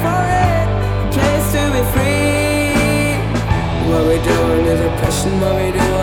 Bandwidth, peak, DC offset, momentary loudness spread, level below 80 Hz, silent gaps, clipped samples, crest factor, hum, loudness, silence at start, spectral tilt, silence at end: 18.5 kHz; -2 dBFS; under 0.1%; 3 LU; -24 dBFS; none; under 0.1%; 12 dB; none; -15 LUFS; 0 s; -5.5 dB/octave; 0 s